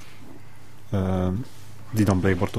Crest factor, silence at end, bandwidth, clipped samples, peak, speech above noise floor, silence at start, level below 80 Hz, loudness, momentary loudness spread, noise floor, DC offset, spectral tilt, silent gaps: 20 dB; 0 s; 15 kHz; under 0.1%; -4 dBFS; 25 dB; 0 s; -48 dBFS; -25 LUFS; 24 LU; -48 dBFS; 2%; -7 dB/octave; none